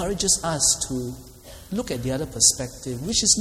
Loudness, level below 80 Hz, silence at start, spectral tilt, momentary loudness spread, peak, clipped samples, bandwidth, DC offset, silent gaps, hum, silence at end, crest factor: -22 LUFS; -42 dBFS; 0 s; -2.5 dB/octave; 14 LU; -2 dBFS; under 0.1%; 16.5 kHz; under 0.1%; none; none; 0 s; 22 dB